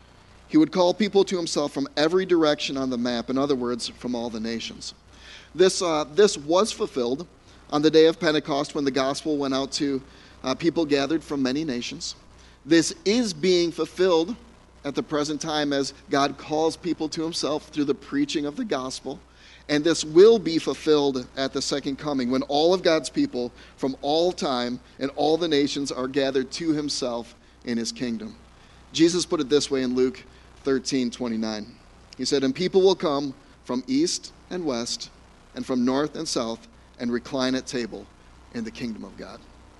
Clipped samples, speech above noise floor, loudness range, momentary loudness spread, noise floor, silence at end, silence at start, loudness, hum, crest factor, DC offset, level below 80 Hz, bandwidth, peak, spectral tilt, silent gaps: under 0.1%; 27 dB; 6 LU; 14 LU; -51 dBFS; 0.4 s; 0.5 s; -24 LUFS; none; 20 dB; under 0.1%; -54 dBFS; 11.5 kHz; -4 dBFS; -4 dB/octave; none